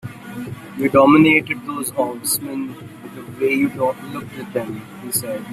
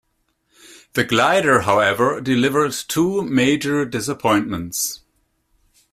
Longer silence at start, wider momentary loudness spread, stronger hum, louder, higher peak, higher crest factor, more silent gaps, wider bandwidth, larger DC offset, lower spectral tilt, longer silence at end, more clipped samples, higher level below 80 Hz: second, 0.05 s vs 0.95 s; first, 20 LU vs 8 LU; neither; about the same, -18 LUFS vs -18 LUFS; about the same, 0 dBFS vs -2 dBFS; about the same, 18 dB vs 18 dB; neither; about the same, 16 kHz vs 16 kHz; neither; about the same, -4.5 dB/octave vs -4 dB/octave; second, 0 s vs 0.95 s; neither; about the same, -56 dBFS vs -54 dBFS